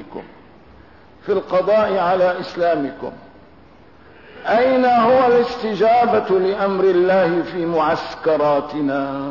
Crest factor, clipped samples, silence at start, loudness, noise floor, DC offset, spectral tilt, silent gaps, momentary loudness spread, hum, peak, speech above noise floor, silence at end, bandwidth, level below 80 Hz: 12 dB; under 0.1%; 0 s; -17 LUFS; -47 dBFS; 0.3%; -7 dB/octave; none; 9 LU; none; -6 dBFS; 30 dB; 0 s; 6 kHz; -54 dBFS